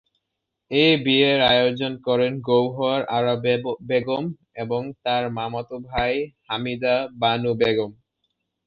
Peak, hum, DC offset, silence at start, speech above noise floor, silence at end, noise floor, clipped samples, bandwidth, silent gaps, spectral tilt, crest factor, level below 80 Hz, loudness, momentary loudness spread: -6 dBFS; none; under 0.1%; 0.7 s; 59 dB; 0.75 s; -81 dBFS; under 0.1%; 5.6 kHz; none; -7.5 dB/octave; 18 dB; -52 dBFS; -22 LUFS; 11 LU